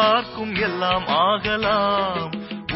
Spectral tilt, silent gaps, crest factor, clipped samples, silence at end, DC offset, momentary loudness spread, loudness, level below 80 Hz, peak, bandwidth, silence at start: -8.5 dB/octave; none; 14 dB; under 0.1%; 0 s; under 0.1%; 8 LU; -21 LUFS; -48 dBFS; -6 dBFS; 5.8 kHz; 0 s